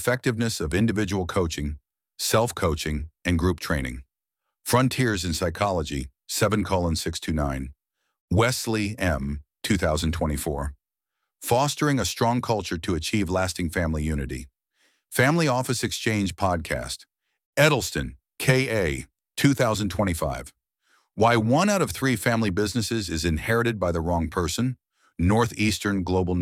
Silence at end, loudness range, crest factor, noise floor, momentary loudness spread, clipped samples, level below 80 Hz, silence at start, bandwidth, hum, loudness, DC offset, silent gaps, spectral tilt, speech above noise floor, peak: 0 s; 3 LU; 20 dB; -84 dBFS; 11 LU; under 0.1%; -40 dBFS; 0 s; 17 kHz; none; -25 LUFS; under 0.1%; 8.21-8.28 s, 17.45-17.53 s; -5 dB/octave; 60 dB; -6 dBFS